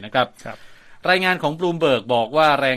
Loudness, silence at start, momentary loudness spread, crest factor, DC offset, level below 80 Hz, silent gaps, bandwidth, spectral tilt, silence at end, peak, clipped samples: -19 LUFS; 0 s; 10 LU; 18 dB; under 0.1%; -58 dBFS; none; 15 kHz; -5 dB/octave; 0 s; -2 dBFS; under 0.1%